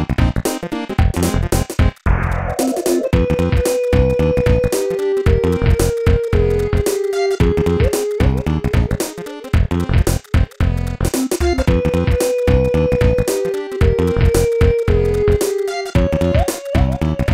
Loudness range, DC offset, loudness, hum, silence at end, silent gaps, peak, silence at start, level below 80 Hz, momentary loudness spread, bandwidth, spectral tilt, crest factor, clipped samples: 2 LU; 0.3%; -17 LUFS; none; 0 s; none; 0 dBFS; 0 s; -22 dBFS; 4 LU; 16.5 kHz; -6.5 dB/octave; 14 dB; under 0.1%